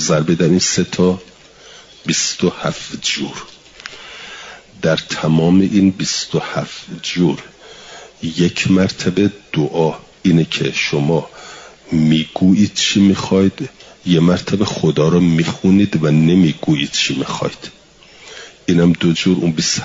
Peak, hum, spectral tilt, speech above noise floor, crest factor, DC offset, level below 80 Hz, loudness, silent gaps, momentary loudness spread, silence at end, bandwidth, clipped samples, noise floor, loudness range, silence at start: -2 dBFS; none; -5 dB/octave; 29 dB; 14 dB; under 0.1%; -50 dBFS; -15 LUFS; none; 19 LU; 0 s; 7.8 kHz; under 0.1%; -43 dBFS; 5 LU; 0 s